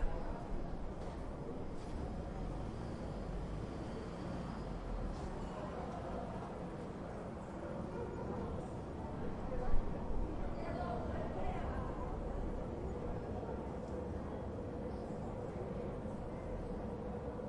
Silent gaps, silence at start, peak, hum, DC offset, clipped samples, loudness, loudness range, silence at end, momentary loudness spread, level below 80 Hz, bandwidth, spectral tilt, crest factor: none; 0 s; -20 dBFS; none; under 0.1%; under 0.1%; -44 LUFS; 3 LU; 0 s; 4 LU; -46 dBFS; 10.5 kHz; -8 dB/octave; 22 dB